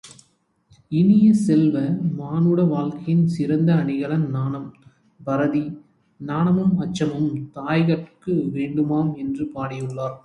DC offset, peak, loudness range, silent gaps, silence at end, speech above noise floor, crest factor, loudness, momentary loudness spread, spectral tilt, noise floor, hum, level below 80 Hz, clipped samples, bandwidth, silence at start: under 0.1%; -6 dBFS; 5 LU; none; 0.05 s; 43 dB; 14 dB; -21 LUFS; 11 LU; -8.5 dB/octave; -63 dBFS; none; -58 dBFS; under 0.1%; 11 kHz; 0.05 s